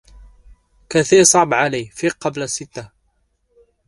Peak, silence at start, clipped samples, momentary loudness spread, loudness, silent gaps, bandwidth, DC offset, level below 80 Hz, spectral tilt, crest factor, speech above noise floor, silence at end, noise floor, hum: 0 dBFS; 0.9 s; under 0.1%; 15 LU; -16 LUFS; none; 11.5 kHz; under 0.1%; -50 dBFS; -3 dB/octave; 20 dB; 49 dB; 1 s; -65 dBFS; none